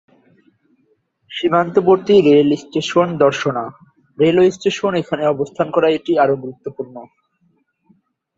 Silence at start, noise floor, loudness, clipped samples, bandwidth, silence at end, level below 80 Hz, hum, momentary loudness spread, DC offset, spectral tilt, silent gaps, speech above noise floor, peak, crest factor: 1.3 s; -62 dBFS; -16 LUFS; under 0.1%; 7.8 kHz; 1.35 s; -58 dBFS; none; 17 LU; under 0.1%; -6 dB/octave; none; 47 dB; 0 dBFS; 16 dB